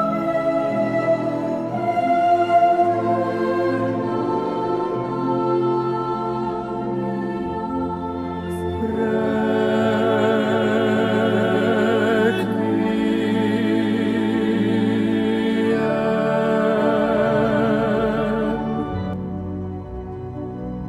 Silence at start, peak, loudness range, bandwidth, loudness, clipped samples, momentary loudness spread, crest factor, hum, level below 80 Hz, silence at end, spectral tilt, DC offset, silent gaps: 0 s; -6 dBFS; 4 LU; 12 kHz; -20 LUFS; under 0.1%; 8 LU; 14 dB; none; -46 dBFS; 0 s; -7.5 dB/octave; under 0.1%; none